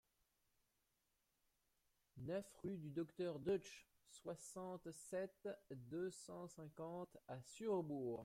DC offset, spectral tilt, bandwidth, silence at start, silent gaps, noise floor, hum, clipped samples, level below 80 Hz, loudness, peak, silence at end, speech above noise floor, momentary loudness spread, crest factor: under 0.1%; -6 dB/octave; 16.5 kHz; 2.15 s; none; -87 dBFS; none; under 0.1%; -82 dBFS; -50 LUFS; -34 dBFS; 0 s; 38 dB; 12 LU; 18 dB